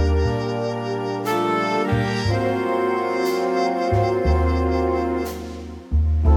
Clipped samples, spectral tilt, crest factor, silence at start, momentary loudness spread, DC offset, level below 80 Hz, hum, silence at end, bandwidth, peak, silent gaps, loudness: under 0.1%; -7 dB/octave; 14 dB; 0 s; 6 LU; under 0.1%; -26 dBFS; none; 0 s; 16.5 kHz; -6 dBFS; none; -22 LUFS